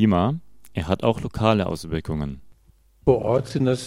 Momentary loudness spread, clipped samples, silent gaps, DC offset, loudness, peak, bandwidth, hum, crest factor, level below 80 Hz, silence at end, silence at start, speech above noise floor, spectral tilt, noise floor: 13 LU; under 0.1%; none; 0.6%; -24 LUFS; -2 dBFS; 15 kHz; none; 20 dB; -42 dBFS; 0 s; 0 s; 35 dB; -7 dB/octave; -57 dBFS